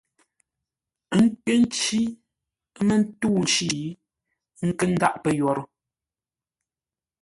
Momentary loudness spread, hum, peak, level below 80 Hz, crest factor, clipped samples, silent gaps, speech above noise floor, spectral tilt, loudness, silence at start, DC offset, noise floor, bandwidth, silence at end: 9 LU; none; -4 dBFS; -60 dBFS; 22 dB; under 0.1%; none; over 68 dB; -4.5 dB/octave; -23 LUFS; 1.1 s; under 0.1%; under -90 dBFS; 11.5 kHz; 1.55 s